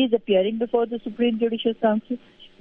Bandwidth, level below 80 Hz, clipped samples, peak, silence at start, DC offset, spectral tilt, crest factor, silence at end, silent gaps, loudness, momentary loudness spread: 3.9 kHz; -62 dBFS; under 0.1%; -8 dBFS; 0 s; under 0.1%; -9 dB/octave; 16 dB; 0.15 s; none; -23 LUFS; 7 LU